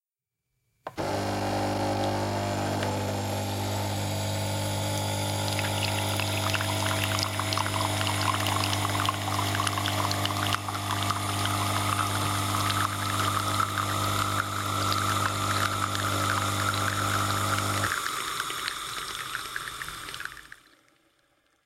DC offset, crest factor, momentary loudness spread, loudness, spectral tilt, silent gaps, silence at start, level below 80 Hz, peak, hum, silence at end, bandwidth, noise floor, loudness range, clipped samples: under 0.1%; 20 dB; 6 LU; -28 LUFS; -3.5 dB/octave; none; 0.85 s; -54 dBFS; -8 dBFS; none; 1.1 s; 16.5 kHz; -87 dBFS; 3 LU; under 0.1%